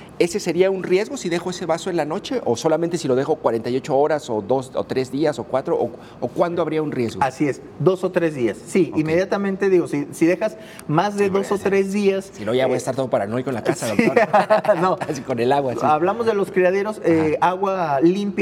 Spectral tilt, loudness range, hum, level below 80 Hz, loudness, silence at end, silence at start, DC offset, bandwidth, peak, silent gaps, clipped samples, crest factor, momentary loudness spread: -6 dB/octave; 3 LU; none; -58 dBFS; -20 LUFS; 0 s; 0 s; under 0.1%; 14.5 kHz; 0 dBFS; none; under 0.1%; 18 dB; 6 LU